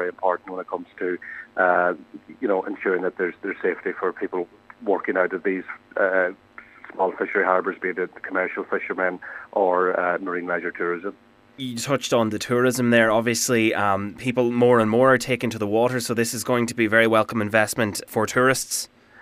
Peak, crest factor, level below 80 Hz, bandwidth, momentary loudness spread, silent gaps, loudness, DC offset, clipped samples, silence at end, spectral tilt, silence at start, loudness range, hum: -2 dBFS; 20 dB; -64 dBFS; 16 kHz; 12 LU; none; -22 LUFS; under 0.1%; under 0.1%; 0.35 s; -4.5 dB/octave; 0 s; 6 LU; none